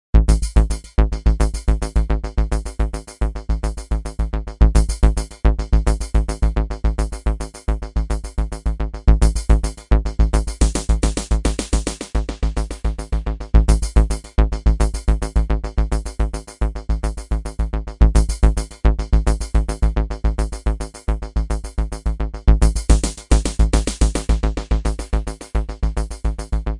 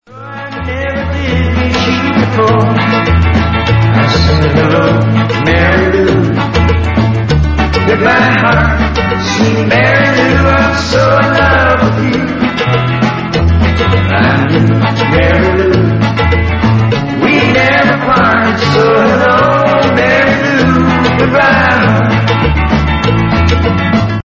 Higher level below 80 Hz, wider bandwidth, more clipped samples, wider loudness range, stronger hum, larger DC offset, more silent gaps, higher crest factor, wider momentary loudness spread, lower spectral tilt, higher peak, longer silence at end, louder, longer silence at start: about the same, -18 dBFS vs -20 dBFS; first, 11.5 kHz vs 7.8 kHz; neither; about the same, 3 LU vs 2 LU; neither; about the same, 0.3% vs 0.3%; neither; first, 16 dB vs 8 dB; first, 9 LU vs 4 LU; about the same, -6 dB/octave vs -6.5 dB/octave; about the same, -2 dBFS vs 0 dBFS; about the same, 0 s vs 0.05 s; second, -21 LUFS vs -9 LUFS; about the same, 0.15 s vs 0.1 s